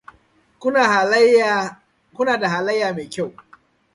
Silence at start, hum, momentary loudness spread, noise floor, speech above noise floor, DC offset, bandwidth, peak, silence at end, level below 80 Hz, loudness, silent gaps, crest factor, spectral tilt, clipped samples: 0.6 s; none; 14 LU; -58 dBFS; 40 dB; under 0.1%; 11.5 kHz; -2 dBFS; 0.65 s; -64 dBFS; -18 LUFS; none; 18 dB; -4 dB/octave; under 0.1%